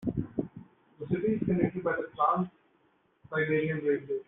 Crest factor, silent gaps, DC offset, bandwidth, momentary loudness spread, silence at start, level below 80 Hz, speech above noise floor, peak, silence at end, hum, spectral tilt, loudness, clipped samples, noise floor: 20 dB; none; under 0.1%; 3.9 kHz; 10 LU; 0 s; -58 dBFS; 40 dB; -12 dBFS; 0.05 s; none; -7 dB/octave; -30 LUFS; under 0.1%; -69 dBFS